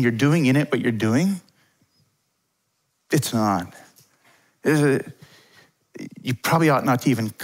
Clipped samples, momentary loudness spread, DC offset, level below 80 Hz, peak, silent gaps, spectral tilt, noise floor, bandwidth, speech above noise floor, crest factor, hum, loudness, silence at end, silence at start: under 0.1%; 14 LU; under 0.1%; -66 dBFS; -6 dBFS; none; -6 dB/octave; -72 dBFS; 16 kHz; 52 dB; 18 dB; none; -21 LUFS; 0 s; 0 s